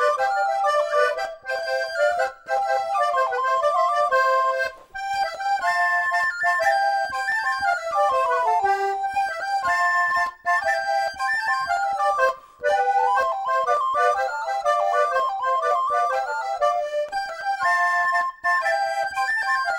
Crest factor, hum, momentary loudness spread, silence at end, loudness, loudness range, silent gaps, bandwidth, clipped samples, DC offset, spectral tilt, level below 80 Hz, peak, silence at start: 14 dB; none; 6 LU; 0 s; -22 LUFS; 1 LU; none; 16.5 kHz; under 0.1%; under 0.1%; -0.5 dB/octave; -60 dBFS; -8 dBFS; 0 s